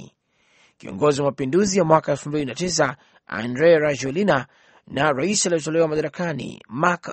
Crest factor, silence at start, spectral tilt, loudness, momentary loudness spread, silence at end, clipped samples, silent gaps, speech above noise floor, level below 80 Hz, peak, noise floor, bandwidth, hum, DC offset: 22 dB; 0 s; -4.5 dB/octave; -21 LUFS; 14 LU; 0 s; under 0.1%; none; 41 dB; -56 dBFS; 0 dBFS; -62 dBFS; 8.8 kHz; none; under 0.1%